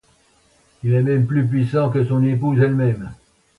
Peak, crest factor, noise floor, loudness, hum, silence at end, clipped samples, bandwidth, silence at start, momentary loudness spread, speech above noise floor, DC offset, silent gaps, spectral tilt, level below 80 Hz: -4 dBFS; 14 dB; -57 dBFS; -19 LUFS; none; 0.45 s; under 0.1%; 4.4 kHz; 0.85 s; 7 LU; 40 dB; under 0.1%; none; -10 dB/octave; -52 dBFS